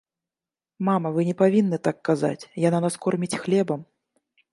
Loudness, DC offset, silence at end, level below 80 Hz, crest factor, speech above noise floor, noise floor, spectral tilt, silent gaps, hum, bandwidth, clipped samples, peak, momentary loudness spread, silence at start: -24 LUFS; under 0.1%; 0.7 s; -70 dBFS; 18 dB; over 67 dB; under -90 dBFS; -7 dB/octave; none; none; 11.5 kHz; under 0.1%; -6 dBFS; 8 LU; 0.8 s